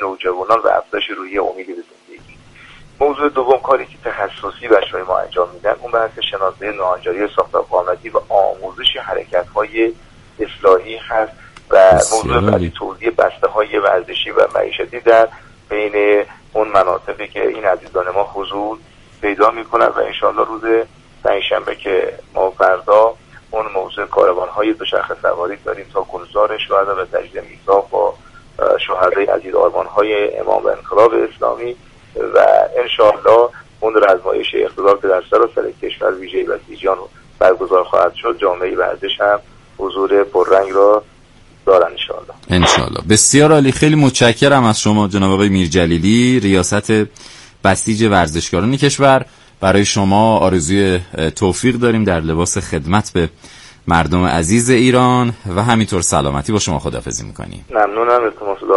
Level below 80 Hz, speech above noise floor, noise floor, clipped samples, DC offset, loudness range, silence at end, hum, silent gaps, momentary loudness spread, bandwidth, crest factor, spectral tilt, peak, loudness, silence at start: -40 dBFS; 31 dB; -44 dBFS; under 0.1%; under 0.1%; 5 LU; 0 s; none; none; 11 LU; 11.5 kHz; 14 dB; -4.5 dB/octave; 0 dBFS; -15 LUFS; 0 s